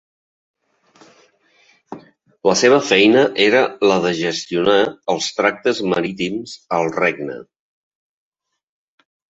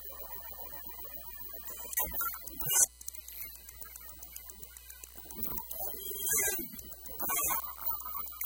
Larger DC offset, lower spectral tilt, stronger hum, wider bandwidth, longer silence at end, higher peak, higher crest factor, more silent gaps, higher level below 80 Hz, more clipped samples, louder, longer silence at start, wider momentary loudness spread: neither; first, -4 dB/octave vs -0.5 dB/octave; neither; second, 8 kHz vs 17 kHz; first, 1.95 s vs 0 s; first, -2 dBFS vs -10 dBFS; second, 18 dB vs 26 dB; neither; about the same, -60 dBFS vs -56 dBFS; neither; first, -16 LUFS vs -33 LUFS; first, 1.9 s vs 0 s; about the same, 16 LU vs 17 LU